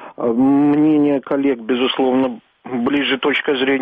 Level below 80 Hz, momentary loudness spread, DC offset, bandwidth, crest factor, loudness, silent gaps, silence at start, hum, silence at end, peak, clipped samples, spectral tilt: -58 dBFS; 8 LU; under 0.1%; 4.8 kHz; 10 dB; -17 LUFS; none; 0 s; none; 0 s; -8 dBFS; under 0.1%; -8 dB/octave